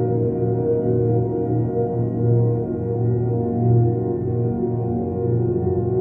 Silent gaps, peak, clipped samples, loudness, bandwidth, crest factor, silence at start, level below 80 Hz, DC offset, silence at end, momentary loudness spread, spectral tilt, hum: none; -8 dBFS; under 0.1%; -21 LUFS; 2 kHz; 12 dB; 0 s; -44 dBFS; under 0.1%; 0 s; 4 LU; -14.5 dB/octave; none